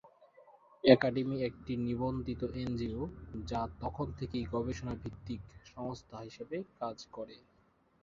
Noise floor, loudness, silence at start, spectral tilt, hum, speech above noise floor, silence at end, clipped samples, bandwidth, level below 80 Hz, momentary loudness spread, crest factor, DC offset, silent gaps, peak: -70 dBFS; -35 LUFS; 0.05 s; -5.5 dB/octave; none; 35 dB; 0.65 s; under 0.1%; 7.4 kHz; -54 dBFS; 17 LU; 28 dB; under 0.1%; none; -8 dBFS